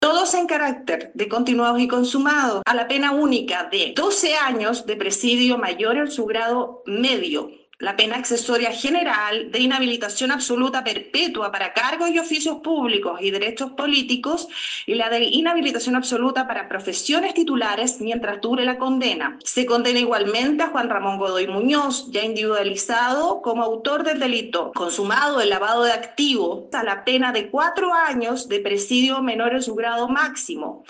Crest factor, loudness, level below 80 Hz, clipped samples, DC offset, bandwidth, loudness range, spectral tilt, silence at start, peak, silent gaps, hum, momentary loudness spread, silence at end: 18 dB; -21 LUFS; -66 dBFS; under 0.1%; under 0.1%; 10 kHz; 2 LU; -2 dB/octave; 0 s; -4 dBFS; none; none; 6 LU; 0.1 s